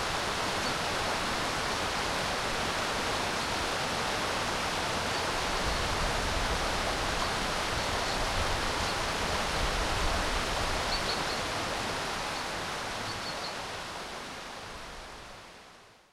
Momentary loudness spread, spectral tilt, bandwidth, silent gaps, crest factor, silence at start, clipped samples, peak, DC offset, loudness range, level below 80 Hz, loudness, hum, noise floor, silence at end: 9 LU; -2.5 dB/octave; 16.5 kHz; none; 14 dB; 0 s; under 0.1%; -18 dBFS; under 0.1%; 5 LU; -42 dBFS; -31 LUFS; none; -55 dBFS; 0.2 s